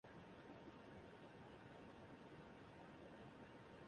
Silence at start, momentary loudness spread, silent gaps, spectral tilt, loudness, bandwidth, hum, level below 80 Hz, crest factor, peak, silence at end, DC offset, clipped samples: 0.05 s; 1 LU; none; -6.5 dB/octave; -61 LUFS; 10 kHz; none; -78 dBFS; 12 dB; -48 dBFS; 0 s; under 0.1%; under 0.1%